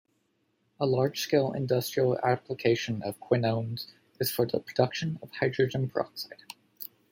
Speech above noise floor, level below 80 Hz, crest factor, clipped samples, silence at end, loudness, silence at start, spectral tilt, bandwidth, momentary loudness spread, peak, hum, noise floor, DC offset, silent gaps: 45 dB; -68 dBFS; 20 dB; under 0.1%; 0.25 s; -29 LUFS; 0.8 s; -5.5 dB/octave; 16.5 kHz; 14 LU; -10 dBFS; none; -74 dBFS; under 0.1%; none